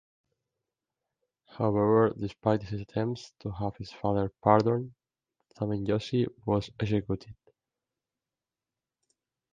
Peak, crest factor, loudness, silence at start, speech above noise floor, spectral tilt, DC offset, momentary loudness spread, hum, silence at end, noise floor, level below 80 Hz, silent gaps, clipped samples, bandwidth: -6 dBFS; 26 dB; -29 LUFS; 1.55 s; over 62 dB; -8 dB/octave; under 0.1%; 12 LU; none; 2.2 s; under -90 dBFS; -56 dBFS; none; under 0.1%; 7.6 kHz